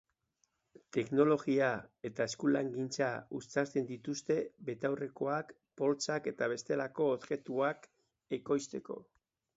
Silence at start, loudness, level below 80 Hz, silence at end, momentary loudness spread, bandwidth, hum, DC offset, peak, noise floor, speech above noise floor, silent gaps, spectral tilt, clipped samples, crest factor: 0.95 s; -35 LUFS; -78 dBFS; 0.55 s; 12 LU; 8 kHz; none; under 0.1%; -16 dBFS; -80 dBFS; 45 dB; none; -5 dB/octave; under 0.1%; 18 dB